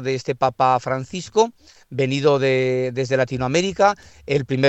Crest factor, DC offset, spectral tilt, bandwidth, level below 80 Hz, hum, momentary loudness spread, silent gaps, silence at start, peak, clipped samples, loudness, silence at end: 18 dB; under 0.1%; -5.5 dB/octave; 8.4 kHz; -52 dBFS; none; 7 LU; none; 0 s; -2 dBFS; under 0.1%; -20 LUFS; 0 s